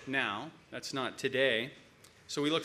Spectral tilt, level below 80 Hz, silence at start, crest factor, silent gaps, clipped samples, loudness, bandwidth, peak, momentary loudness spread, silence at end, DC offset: -3.5 dB/octave; -74 dBFS; 0 s; 20 dB; none; under 0.1%; -34 LUFS; 15.5 kHz; -16 dBFS; 14 LU; 0 s; under 0.1%